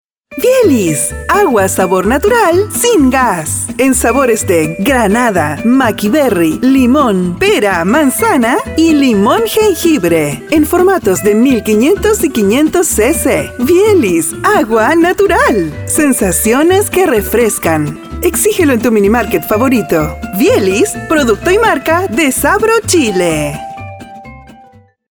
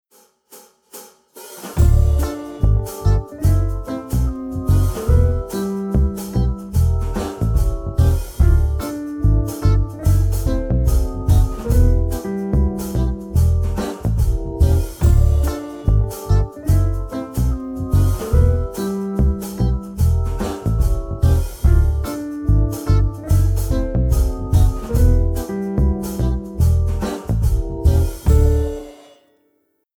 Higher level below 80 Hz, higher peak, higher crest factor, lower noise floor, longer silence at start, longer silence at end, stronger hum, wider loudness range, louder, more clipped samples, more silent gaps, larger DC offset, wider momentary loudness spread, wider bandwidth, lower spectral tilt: second, -32 dBFS vs -20 dBFS; first, 0 dBFS vs -4 dBFS; about the same, 10 dB vs 14 dB; second, -42 dBFS vs -65 dBFS; second, 0.3 s vs 0.55 s; second, 0.7 s vs 1.05 s; neither; about the same, 1 LU vs 1 LU; first, -10 LUFS vs -19 LUFS; neither; neither; neither; about the same, 5 LU vs 7 LU; first, over 20 kHz vs 18 kHz; second, -4.5 dB/octave vs -7.5 dB/octave